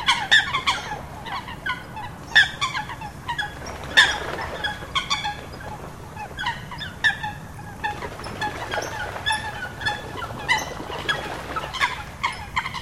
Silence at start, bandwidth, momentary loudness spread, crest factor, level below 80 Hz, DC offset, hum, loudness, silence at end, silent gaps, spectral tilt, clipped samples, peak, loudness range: 0 s; 16 kHz; 17 LU; 26 dB; -44 dBFS; 0.2%; none; -24 LUFS; 0 s; none; -2 dB/octave; under 0.1%; 0 dBFS; 7 LU